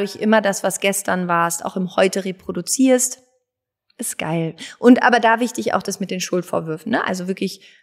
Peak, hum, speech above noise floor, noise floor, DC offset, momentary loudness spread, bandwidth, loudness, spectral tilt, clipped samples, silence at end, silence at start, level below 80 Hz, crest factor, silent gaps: 0 dBFS; none; 61 dB; -80 dBFS; under 0.1%; 12 LU; 16 kHz; -19 LUFS; -4 dB/octave; under 0.1%; 0.25 s; 0 s; -66 dBFS; 18 dB; none